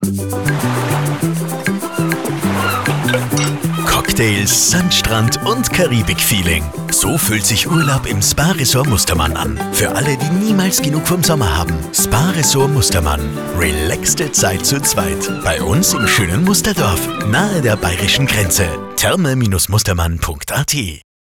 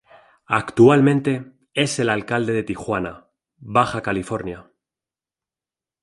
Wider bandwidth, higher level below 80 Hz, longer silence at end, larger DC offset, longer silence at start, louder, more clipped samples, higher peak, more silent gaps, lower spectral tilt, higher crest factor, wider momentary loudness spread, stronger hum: first, 19.5 kHz vs 11.5 kHz; first, -30 dBFS vs -52 dBFS; second, 0.35 s vs 1.4 s; neither; second, 0 s vs 0.5 s; first, -14 LUFS vs -20 LUFS; neither; about the same, -2 dBFS vs -2 dBFS; neither; second, -3.5 dB/octave vs -6 dB/octave; second, 12 dB vs 20 dB; second, 6 LU vs 14 LU; neither